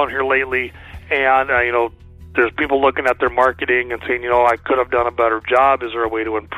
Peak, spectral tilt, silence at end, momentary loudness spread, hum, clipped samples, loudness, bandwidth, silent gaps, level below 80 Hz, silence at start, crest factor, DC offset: -2 dBFS; -6 dB/octave; 0 s; 7 LU; none; under 0.1%; -17 LUFS; 13.5 kHz; none; -42 dBFS; 0 s; 14 dB; under 0.1%